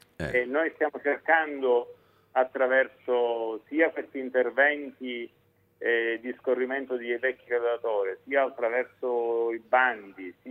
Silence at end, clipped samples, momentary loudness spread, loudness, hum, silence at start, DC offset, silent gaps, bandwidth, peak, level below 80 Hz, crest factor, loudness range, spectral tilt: 0 s; under 0.1%; 10 LU; -27 LUFS; none; 0.2 s; under 0.1%; none; 4.7 kHz; -8 dBFS; -64 dBFS; 20 dB; 2 LU; -6.5 dB/octave